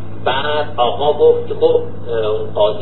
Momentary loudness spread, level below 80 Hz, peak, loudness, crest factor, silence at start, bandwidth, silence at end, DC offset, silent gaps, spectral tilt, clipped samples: 7 LU; -44 dBFS; 0 dBFS; -16 LUFS; 14 dB; 0 s; 4.4 kHz; 0 s; 9%; none; -10.5 dB/octave; under 0.1%